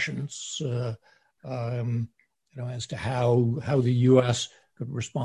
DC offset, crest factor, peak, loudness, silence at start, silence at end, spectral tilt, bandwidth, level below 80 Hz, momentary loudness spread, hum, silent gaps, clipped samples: under 0.1%; 18 dB; -8 dBFS; -27 LUFS; 0 s; 0 s; -6 dB/octave; 10.5 kHz; -56 dBFS; 18 LU; none; none; under 0.1%